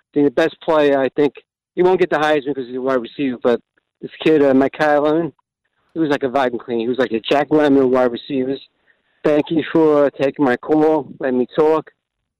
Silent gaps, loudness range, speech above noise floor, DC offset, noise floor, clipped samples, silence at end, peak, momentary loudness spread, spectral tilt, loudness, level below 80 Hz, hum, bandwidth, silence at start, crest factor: none; 1 LU; 52 dB; under 0.1%; -68 dBFS; under 0.1%; 0.6 s; -6 dBFS; 9 LU; -7 dB/octave; -17 LUFS; -58 dBFS; none; 9.6 kHz; 0.15 s; 12 dB